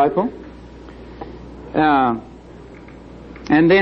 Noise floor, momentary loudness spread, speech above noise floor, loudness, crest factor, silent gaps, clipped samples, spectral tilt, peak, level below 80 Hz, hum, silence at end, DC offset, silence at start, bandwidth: -39 dBFS; 24 LU; 24 dB; -18 LUFS; 16 dB; none; under 0.1%; -7.5 dB/octave; -4 dBFS; -44 dBFS; 60 Hz at -45 dBFS; 0 s; under 0.1%; 0 s; 6.4 kHz